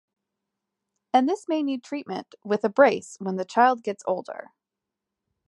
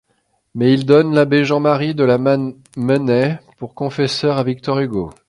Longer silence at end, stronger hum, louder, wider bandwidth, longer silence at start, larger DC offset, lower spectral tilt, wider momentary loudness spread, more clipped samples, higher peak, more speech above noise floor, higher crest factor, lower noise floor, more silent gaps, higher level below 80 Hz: first, 1.1 s vs 0.15 s; neither; second, -24 LUFS vs -16 LUFS; about the same, 11.5 kHz vs 11.5 kHz; first, 1.15 s vs 0.55 s; neither; second, -5.5 dB/octave vs -7 dB/octave; about the same, 14 LU vs 12 LU; neither; second, -4 dBFS vs 0 dBFS; first, 62 dB vs 49 dB; first, 22 dB vs 16 dB; first, -86 dBFS vs -65 dBFS; neither; second, -78 dBFS vs -52 dBFS